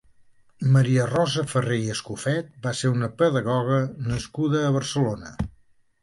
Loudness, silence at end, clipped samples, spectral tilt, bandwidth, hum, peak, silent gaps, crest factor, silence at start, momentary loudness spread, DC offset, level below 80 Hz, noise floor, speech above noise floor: -24 LUFS; 0.5 s; under 0.1%; -6 dB/octave; 11.5 kHz; none; -8 dBFS; none; 16 dB; 0.6 s; 9 LU; under 0.1%; -48 dBFS; -58 dBFS; 35 dB